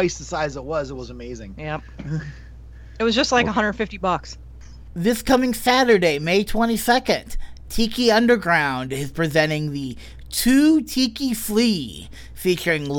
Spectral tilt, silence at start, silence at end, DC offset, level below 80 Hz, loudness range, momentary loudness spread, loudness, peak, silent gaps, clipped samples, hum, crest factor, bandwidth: -4.5 dB/octave; 0 s; 0 s; under 0.1%; -38 dBFS; 5 LU; 17 LU; -20 LUFS; -4 dBFS; none; under 0.1%; none; 16 dB; 19 kHz